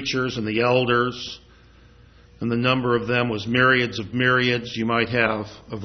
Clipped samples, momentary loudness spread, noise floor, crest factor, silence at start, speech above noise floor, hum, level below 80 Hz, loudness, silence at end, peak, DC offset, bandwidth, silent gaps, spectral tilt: under 0.1%; 12 LU; -50 dBFS; 20 dB; 0 s; 29 dB; none; -52 dBFS; -21 LUFS; 0 s; -4 dBFS; under 0.1%; 6.4 kHz; none; -5.5 dB/octave